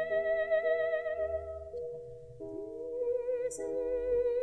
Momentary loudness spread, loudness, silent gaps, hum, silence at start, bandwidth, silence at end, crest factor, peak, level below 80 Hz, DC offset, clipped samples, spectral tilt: 13 LU; -34 LUFS; none; none; 0 s; 11 kHz; 0 s; 14 dB; -20 dBFS; -58 dBFS; under 0.1%; under 0.1%; -4.5 dB/octave